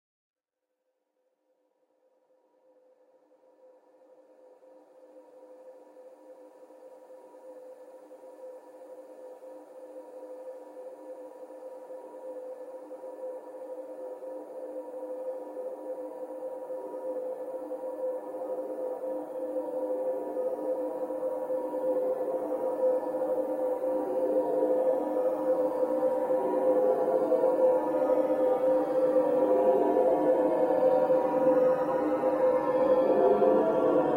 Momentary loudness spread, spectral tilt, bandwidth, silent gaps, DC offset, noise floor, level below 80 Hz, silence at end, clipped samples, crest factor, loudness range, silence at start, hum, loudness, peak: 22 LU; -7.5 dB/octave; 15.5 kHz; none; under 0.1%; -85 dBFS; -72 dBFS; 0 s; under 0.1%; 18 dB; 21 LU; 5 s; none; -28 LUFS; -12 dBFS